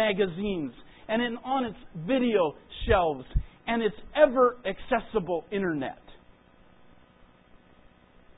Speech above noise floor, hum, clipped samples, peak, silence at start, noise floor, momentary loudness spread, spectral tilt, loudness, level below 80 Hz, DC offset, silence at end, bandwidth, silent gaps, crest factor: 30 dB; none; under 0.1%; -6 dBFS; 0 s; -57 dBFS; 12 LU; -10 dB/octave; -28 LUFS; -42 dBFS; under 0.1%; 2.25 s; 4 kHz; none; 22 dB